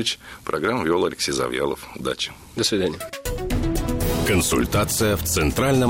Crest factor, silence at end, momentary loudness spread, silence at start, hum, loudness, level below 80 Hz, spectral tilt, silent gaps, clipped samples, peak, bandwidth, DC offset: 14 dB; 0 s; 9 LU; 0 s; none; -23 LUFS; -34 dBFS; -4 dB/octave; none; under 0.1%; -8 dBFS; 16.5 kHz; under 0.1%